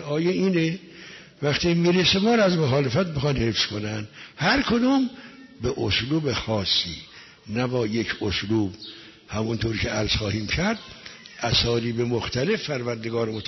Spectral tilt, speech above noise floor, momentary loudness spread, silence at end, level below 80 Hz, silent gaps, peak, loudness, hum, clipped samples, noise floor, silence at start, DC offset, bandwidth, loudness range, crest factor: -5 dB/octave; 21 dB; 18 LU; 0 s; -44 dBFS; none; -10 dBFS; -24 LUFS; none; under 0.1%; -44 dBFS; 0 s; under 0.1%; 6.4 kHz; 4 LU; 14 dB